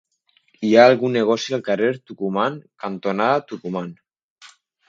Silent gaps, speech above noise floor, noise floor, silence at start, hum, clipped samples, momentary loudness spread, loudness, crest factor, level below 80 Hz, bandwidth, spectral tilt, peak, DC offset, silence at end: 4.23-4.36 s; 43 dB; -62 dBFS; 0.6 s; none; under 0.1%; 16 LU; -19 LUFS; 20 dB; -70 dBFS; 7.6 kHz; -5.5 dB/octave; 0 dBFS; under 0.1%; 0.4 s